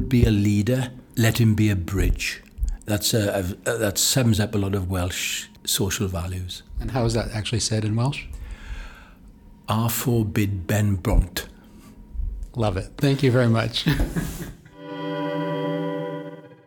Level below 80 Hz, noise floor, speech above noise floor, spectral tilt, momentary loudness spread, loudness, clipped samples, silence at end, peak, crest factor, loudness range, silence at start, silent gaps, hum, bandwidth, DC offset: -34 dBFS; -47 dBFS; 25 dB; -5 dB/octave; 16 LU; -23 LUFS; under 0.1%; 0.15 s; -4 dBFS; 20 dB; 4 LU; 0 s; none; none; 19 kHz; under 0.1%